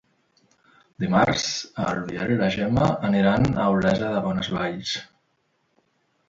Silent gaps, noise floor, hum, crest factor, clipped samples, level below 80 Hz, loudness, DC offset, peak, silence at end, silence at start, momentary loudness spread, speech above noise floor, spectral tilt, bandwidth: none; -70 dBFS; none; 18 dB; under 0.1%; -48 dBFS; -23 LUFS; under 0.1%; -6 dBFS; 1.25 s; 1 s; 8 LU; 47 dB; -5.5 dB/octave; 7.8 kHz